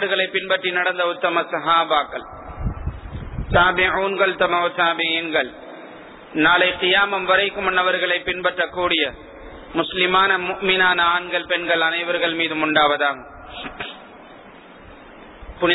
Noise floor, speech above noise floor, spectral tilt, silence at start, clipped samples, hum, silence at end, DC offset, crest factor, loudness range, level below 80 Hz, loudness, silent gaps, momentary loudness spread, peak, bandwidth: -43 dBFS; 23 dB; -7 dB/octave; 0 s; under 0.1%; none; 0 s; under 0.1%; 18 dB; 3 LU; -40 dBFS; -19 LUFS; none; 17 LU; -2 dBFS; 4.1 kHz